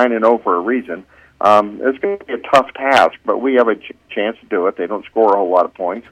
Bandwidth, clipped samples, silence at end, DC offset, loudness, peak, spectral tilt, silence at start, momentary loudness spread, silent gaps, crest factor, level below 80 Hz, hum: 14.5 kHz; under 0.1%; 0.1 s; under 0.1%; -16 LUFS; 0 dBFS; -5 dB/octave; 0 s; 11 LU; none; 14 dB; -58 dBFS; none